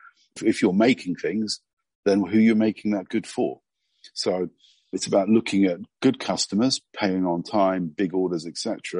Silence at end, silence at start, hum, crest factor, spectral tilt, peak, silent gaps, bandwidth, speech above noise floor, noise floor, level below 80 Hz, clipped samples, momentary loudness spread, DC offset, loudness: 0 s; 0.35 s; none; 16 dB; -5 dB/octave; -8 dBFS; 1.73-1.77 s, 1.95-2.03 s; 10.5 kHz; 32 dB; -55 dBFS; -68 dBFS; under 0.1%; 10 LU; under 0.1%; -24 LUFS